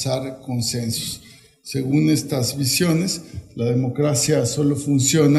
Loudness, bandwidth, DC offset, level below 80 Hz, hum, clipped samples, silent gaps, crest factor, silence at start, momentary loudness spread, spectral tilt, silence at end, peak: -20 LUFS; 15 kHz; under 0.1%; -54 dBFS; none; under 0.1%; none; 16 dB; 0 s; 11 LU; -5 dB/octave; 0 s; -4 dBFS